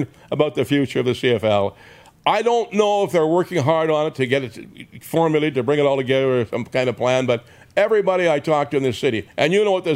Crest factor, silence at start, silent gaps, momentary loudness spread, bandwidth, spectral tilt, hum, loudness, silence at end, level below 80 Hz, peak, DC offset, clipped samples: 18 dB; 0 s; none; 6 LU; 16 kHz; -6 dB/octave; none; -19 LUFS; 0 s; -60 dBFS; -2 dBFS; under 0.1%; under 0.1%